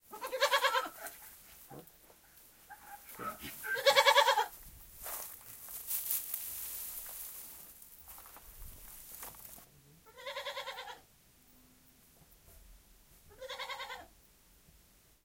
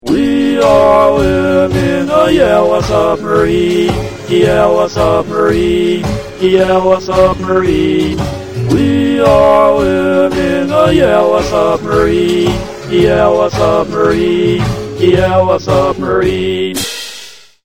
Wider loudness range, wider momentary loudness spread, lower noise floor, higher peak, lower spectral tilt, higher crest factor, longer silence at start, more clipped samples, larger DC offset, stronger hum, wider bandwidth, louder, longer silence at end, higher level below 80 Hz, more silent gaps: first, 18 LU vs 2 LU; first, 24 LU vs 7 LU; first, -65 dBFS vs -33 dBFS; second, -10 dBFS vs 0 dBFS; second, 0 dB/octave vs -6 dB/octave; first, 28 dB vs 10 dB; about the same, 0.1 s vs 0.05 s; second, under 0.1% vs 0.2%; second, under 0.1% vs 1%; neither; about the same, 17 kHz vs 16.5 kHz; second, -34 LUFS vs -11 LUFS; first, 1.2 s vs 0.3 s; second, -64 dBFS vs -30 dBFS; neither